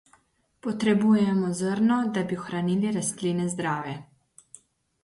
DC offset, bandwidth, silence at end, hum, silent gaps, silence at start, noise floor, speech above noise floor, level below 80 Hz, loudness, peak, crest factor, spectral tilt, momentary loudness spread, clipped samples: under 0.1%; 11.5 kHz; 1 s; none; none; 0.65 s; -64 dBFS; 39 dB; -66 dBFS; -25 LUFS; -12 dBFS; 16 dB; -6 dB/octave; 11 LU; under 0.1%